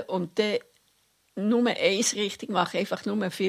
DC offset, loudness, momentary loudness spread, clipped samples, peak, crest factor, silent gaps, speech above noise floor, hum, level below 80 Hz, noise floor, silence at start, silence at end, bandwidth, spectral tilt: under 0.1%; -26 LUFS; 7 LU; under 0.1%; -8 dBFS; 20 dB; none; 41 dB; none; -72 dBFS; -67 dBFS; 0 s; 0 s; 15.5 kHz; -3.5 dB/octave